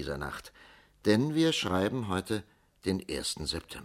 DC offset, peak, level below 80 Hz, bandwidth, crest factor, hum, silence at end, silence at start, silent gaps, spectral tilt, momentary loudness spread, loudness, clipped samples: under 0.1%; -12 dBFS; -54 dBFS; 16 kHz; 20 dB; none; 0 s; 0 s; none; -5 dB/octave; 11 LU; -31 LUFS; under 0.1%